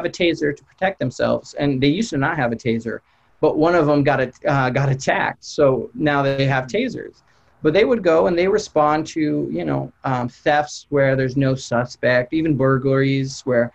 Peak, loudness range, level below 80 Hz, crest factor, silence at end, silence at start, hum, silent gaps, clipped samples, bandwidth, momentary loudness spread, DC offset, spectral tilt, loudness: -6 dBFS; 2 LU; -50 dBFS; 14 dB; 0.05 s; 0 s; none; none; under 0.1%; 8.4 kHz; 7 LU; under 0.1%; -6.5 dB/octave; -19 LUFS